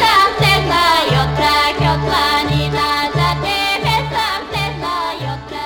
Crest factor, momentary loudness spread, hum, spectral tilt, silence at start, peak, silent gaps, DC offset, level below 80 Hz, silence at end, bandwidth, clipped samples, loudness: 16 dB; 8 LU; none; -4.5 dB/octave; 0 s; 0 dBFS; none; under 0.1%; -32 dBFS; 0 s; 19.5 kHz; under 0.1%; -15 LUFS